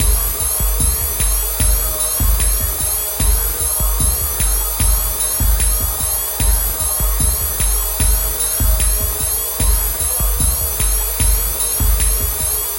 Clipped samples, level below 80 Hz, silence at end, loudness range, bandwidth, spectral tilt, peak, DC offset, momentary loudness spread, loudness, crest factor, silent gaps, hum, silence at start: under 0.1%; -20 dBFS; 0 s; 0 LU; 16.5 kHz; -2.5 dB/octave; -2 dBFS; under 0.1%; 1 LU; -15 LUFS; 14 dB; none; none; 0 s